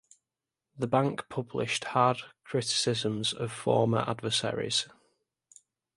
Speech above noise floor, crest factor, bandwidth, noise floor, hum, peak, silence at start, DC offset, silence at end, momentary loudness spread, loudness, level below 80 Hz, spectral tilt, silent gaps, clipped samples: 60 dB; 22 dB; 11.5 kHz; -90 dBFS; none; -10 dBFS; 0.75 s; under 0.1%; 1.1 s; 9 LU; -29 LUFS; -66 dBFS; -4 dB/octave; none; under 0.1%